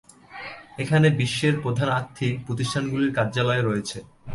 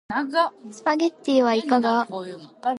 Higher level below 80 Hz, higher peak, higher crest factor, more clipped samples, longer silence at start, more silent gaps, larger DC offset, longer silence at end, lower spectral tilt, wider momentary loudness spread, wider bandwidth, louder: first, -54 dBFS vs -68 dBFS; about the same, -6 dBFS vs -6 dBFS; about the same, 18 dB vs 16 dB; neither; first, 0.3 s vs 0.1 s; neither; neither; about the same, 0 s vs 0 s; first, -6 dB/octave vs -4.5 dB/octave; first, 18 LU vs 10 LU; about the same, 11.5 kHz vs 11 kHz; about the same, -23 LUFS vs -22 LUFS